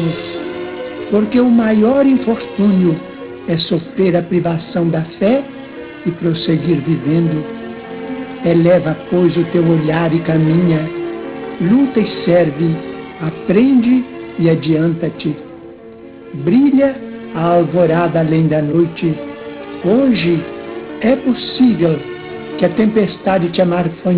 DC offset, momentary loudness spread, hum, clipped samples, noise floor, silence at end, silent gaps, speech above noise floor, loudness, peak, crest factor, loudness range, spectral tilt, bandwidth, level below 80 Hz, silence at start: under 0.1%; 15 LU; none; under 0.1%; -35 dBFS; 0 s; none; 22 dB; -15 LUFS; 0 dBFS; 14 dB; 3 LU; -12 dB/octave; 4 kHz; -48 dBFS; 0 s